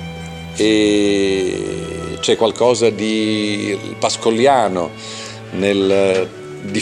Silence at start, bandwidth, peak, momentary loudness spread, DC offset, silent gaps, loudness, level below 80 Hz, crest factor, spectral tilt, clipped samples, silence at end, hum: 0 s; 11.5 kHz; -2 dBFS; 14 LU; under 0.1%; none; -17 LUFS; -48 dBFS; 16 dB; -4.5 dB/octave; under 0.1%; 0 s; none